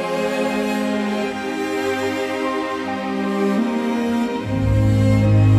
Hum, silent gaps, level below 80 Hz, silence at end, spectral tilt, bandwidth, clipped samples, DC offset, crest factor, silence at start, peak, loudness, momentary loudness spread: none; none; -36 dBFS; 0 s; -7 dB/octave; 13 kHz; under 0.1%; under 0.1%; 14 dB; 0 s; -6 dBFS; -20 LUFS; 7 LU